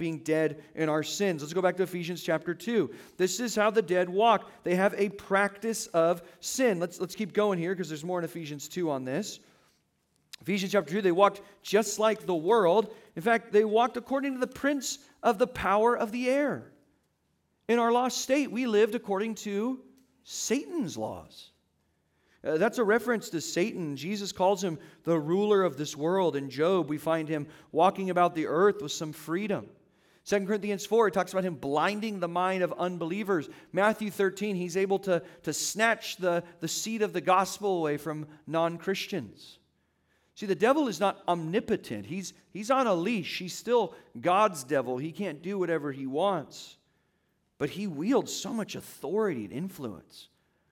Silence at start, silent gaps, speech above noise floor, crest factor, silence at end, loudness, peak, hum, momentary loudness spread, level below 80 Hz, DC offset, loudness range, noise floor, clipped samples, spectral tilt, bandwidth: 0 s; none; 46 dB; 22 dB; 0.5 s; -29 LUFS; -8 dBFS; none; 10 LU; -70 dBFS; under 0.1%; 6 LU; -74 dBFS; under 0.1%; -4.5 dB/octave; 17.5 kHz